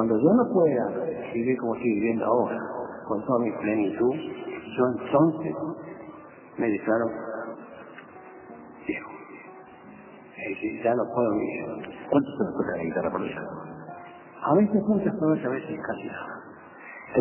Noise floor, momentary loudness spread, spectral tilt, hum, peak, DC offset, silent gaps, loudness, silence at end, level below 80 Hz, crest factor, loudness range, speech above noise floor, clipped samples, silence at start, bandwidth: -47 dBFS; 22 LU; -11.5 dB/octave; none; -8 dBFS; under 0.1%; none; -27 LUFS; 0 s; -62 dBFS; 18 dB; 6 LU; 22 dB; under 0.1%; 0 s; 3.2 kHz